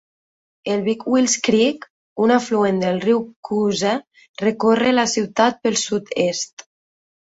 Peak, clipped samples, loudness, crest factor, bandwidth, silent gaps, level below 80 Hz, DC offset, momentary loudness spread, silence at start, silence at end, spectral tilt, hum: -2 dBFS; under 0.1%; -19 LUFS; 18 dB; 8 kHz; 1.90-2.16 s, 3.36-3.43 s, 4.07-4.11 s, 4.29-4.34 s, 6.53-6.57 s; -62 dBFS; under 0.1%; 9 LU; 0.65 s; 0.7 s; -4 dB/octave; none